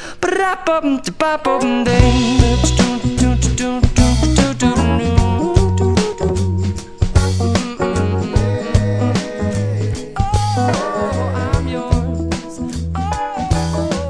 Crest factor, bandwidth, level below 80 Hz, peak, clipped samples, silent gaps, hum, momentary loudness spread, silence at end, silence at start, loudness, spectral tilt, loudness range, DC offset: 16 dB; 11 kHz; -22 dBFS; 0 dBFS; under 0.1%; none; none; 7 LU; 0 s; 0 s; -17 LUFS; -6 dB/octave; 5 LU; under 0.1%